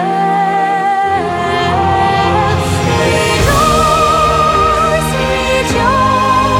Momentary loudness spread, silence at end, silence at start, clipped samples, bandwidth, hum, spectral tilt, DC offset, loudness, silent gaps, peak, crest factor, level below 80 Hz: 4 LU; 0 s; 0 s; under 0.1%; 19 kHz; none; -4.5 dB/octave; under 0.1%; -11 LUFS; none; 0 dBFS; 12 dB; -26 dBFS